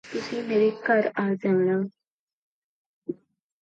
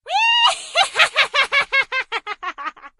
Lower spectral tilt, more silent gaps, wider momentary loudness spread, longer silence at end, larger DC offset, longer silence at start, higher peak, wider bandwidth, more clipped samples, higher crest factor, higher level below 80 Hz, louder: first, -7 dB/octave vs 1.5 dB/octave; first, 2.07-2.27 s, 2.33-3.02 s vs none; about the same, 15 LU vs 14 LU; first, 0.5 s vs 0.1 s; neither; about the same, 0.05 s vs 0.05 s; second, -10 dBFS vs 0 dBFS; second, 7.8 kHz vs 13.5 kHz; neither; about the same, 16 dB vs 20 dB; second, -74 dBFS vs -60 dBFS; second, -25 LUFS vs -16 LUFS